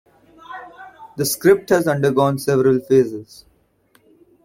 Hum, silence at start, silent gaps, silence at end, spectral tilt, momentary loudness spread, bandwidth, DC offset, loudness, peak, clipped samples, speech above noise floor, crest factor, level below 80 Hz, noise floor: none; 0.5 s; none; 1.2 s; -5.5 dB/octave; 21 LU; 16.5 kHz; under 0.1%; -17 LUFS; -2 dBFS; under 0.1%; 42 dB; 18 dB; -56 dBFS; -59 dBFS